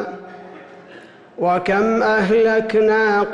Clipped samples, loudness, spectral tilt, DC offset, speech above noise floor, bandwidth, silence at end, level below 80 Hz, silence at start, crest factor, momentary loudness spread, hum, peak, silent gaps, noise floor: under 0.1%; -16 LUFS; -6.5 dB/octave; under 0.1%; 26 dB; 7.8 kHz; 0 s; -54 dBFS; 0 s; 10 dB; 19 LU; none; -8 dBFS; none; -42 dBFS